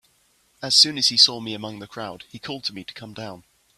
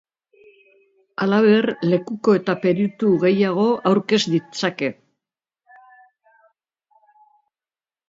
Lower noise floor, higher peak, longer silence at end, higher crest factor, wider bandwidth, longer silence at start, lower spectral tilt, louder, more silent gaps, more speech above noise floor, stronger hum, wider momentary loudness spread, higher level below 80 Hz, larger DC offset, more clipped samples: second, -63 dBFS vs under -90 dBFS; about the same, -2 dBFS vs -4 dBFS; second, 0.4 s vs 3.15 s; first, 24 dB vs 18 dB; first, 14.5 kHz vs 7.8 kHz; second, 0.6 s vs 1.2 s; second, -1.5 dB/octave vs -6 dB/octave; about the same, -17 LUFS vs -19 LUFS; neither; second, 40 dB vs over 72 dB; neither; first, 22 LU vs 9 LU; about the same, -66 dBFS vs -68 dBFS; neither; neither